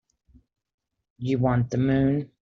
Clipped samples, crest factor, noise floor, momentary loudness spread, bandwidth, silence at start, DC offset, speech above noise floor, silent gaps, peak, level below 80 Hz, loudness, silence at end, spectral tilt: under 0.1%; 16 dB; -60 dBFS; 6 LU; 6.8 kHz; 1.2 s; under 0.1%; 37 dB; none; -10 dBFS; -50 dBFS; -24 LUFS; 0.15 s; -8.5 dB/octave